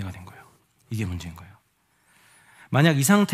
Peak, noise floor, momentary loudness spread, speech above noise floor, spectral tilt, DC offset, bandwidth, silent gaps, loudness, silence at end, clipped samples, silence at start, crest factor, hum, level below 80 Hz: -2 dBFS; -66 dBFS; 25 LU; 45 dB; -5 dB/octave; under 0.1%; 16 kHz; none; -23 LUFS; 0 s; under 0.1%; 0 s; 24 dB; none; -54 dBFS